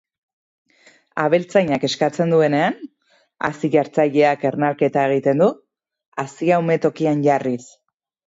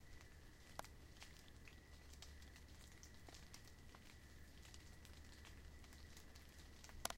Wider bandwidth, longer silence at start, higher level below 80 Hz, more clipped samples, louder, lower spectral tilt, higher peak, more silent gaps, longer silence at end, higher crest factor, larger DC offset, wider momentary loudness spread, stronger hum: second, 8 kHz vs 16.5 kHz; first, 1.15 s vs 0 s; about the same, -66 dBFS vs -64 dBFS; neither; first, -19 LUFS vs -61 LUFS; first, -6.5 dB/octave vs -3 dB/octave; first, -2 dBFS vs -22 dBFS; first, 6.06-6.12 s vs none; first, 0.6 s vs 0 s; second, 16 dB vs 36 dB; neither; first, 12 LU vs 5 LU; neither